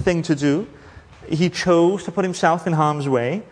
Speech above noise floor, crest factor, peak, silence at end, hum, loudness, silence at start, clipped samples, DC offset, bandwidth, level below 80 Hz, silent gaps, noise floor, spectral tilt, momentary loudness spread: 22 dB; 18 dB; -2 dBFS; 0.05 s; none; -20 LUFS; 0 s; under 0.1%; under 0.1%; 10.5 kHz; -50 dBFS; none; -41 dBFS; -6 dB/octave; 7 LU